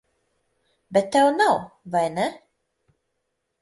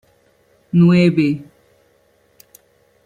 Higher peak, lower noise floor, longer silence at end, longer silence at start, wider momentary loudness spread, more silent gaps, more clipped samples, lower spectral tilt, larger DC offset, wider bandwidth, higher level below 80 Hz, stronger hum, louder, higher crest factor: second, -6 dBFS vs -2 dBFS; first, -77 dBFS vs -58 dBFS; second, 1.25 s vs 1.65 s; first, 0.9 s vs 0.75 s; about the same, 9 LU vs 9 LU; neither; neither; second, -4.5 dB/octave vs -8.5 dB/octave; neither; first, 11.5 kHz vs 7.4 kHz; second, -66 dBFS vs -56 dBFS; neither; second, -22 LUFS vs -15 LUFS; about the same, 18 dB vs 16 dB